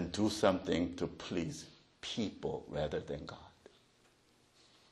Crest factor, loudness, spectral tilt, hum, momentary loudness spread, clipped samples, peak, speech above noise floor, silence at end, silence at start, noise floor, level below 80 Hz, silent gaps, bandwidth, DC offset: 24 dB; -37 LUFS; -5 dB/octave; none; 17 LU; under 0.1%; -14 dBFS; 33 dB; 1.45 s; 0 s; -69 dBFS; -60 dBFS; none; 12 kHz; under 0.1%